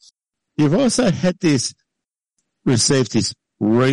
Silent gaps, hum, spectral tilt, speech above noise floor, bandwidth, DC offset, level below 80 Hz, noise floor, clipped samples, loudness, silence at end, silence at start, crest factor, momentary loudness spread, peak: none; none; -4.5 dB/octave; 67 dB; 11.5 kHz; under 0.1%; -52 dBFS; -83 dBFS; under 0.1%; -18 LUFS; 0 s; 0.6 s; 14 dB; 10 LU; -6 dBFS